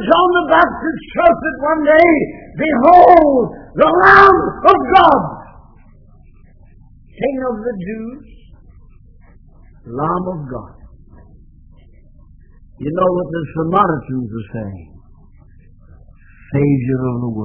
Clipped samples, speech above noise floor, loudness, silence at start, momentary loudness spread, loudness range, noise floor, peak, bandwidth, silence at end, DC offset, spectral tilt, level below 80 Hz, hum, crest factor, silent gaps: 0.4%; 30 dB; -13 LUFS; 0 s; 19 LU; 17 LU; -43 dBFS; 0 dBFS; 5.4 kHz; 0 s; under 0.1%; -8.5 dB/octave; -40 dBFS; none; 16 dB; none